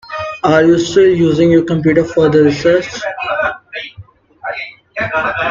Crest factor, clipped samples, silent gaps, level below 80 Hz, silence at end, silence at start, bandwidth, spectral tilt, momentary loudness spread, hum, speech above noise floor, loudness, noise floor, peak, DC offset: 14 dB; under 0.1%; none; -46 dBFS; 0 s; 0.05 s; 7.6 kHz; -6 dB/octave; 15 LU; none; 28 dB; -13 LUFS; -39 dBFS; 0 dBFS; under 0.1%